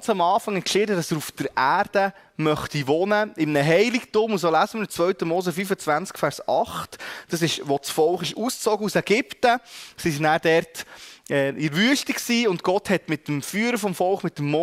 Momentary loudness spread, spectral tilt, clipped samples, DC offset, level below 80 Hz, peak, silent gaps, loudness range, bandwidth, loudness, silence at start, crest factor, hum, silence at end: 7 LU; -4.5 dB/octave; under 0.1%; under 0.1%; -60 dBFS; -6 dBFS; none; 3 LU; 16 kHz; -23 LUFS; 0 s; 16 dB; none; 0 s